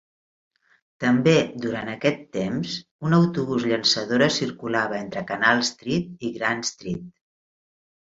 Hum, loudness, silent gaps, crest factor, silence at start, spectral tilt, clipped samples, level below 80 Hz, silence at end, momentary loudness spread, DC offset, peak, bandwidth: none; -23 LUFS; 2.91-2.99 s; 20 dB; 1 s; -4.5 dB/octave; under 0.1%; -58 dBFS; 0.9 s; 10 LU; under 0.1%; -4 dBFS; 7.8 kHz